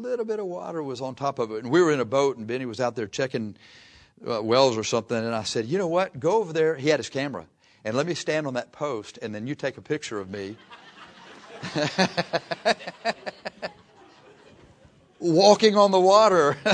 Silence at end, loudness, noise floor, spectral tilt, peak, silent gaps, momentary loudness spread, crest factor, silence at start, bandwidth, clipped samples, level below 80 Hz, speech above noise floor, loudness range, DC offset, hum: 0 s; -24 LUFS; -56 dBFS; -4.5 dB/octave; -4 dBFS; none; 18 LU; 22 dB; 0 s; 10.5 kHz; under 0.1%; -68 dBFS; 32 dB; 7 LU; under 0.1%; none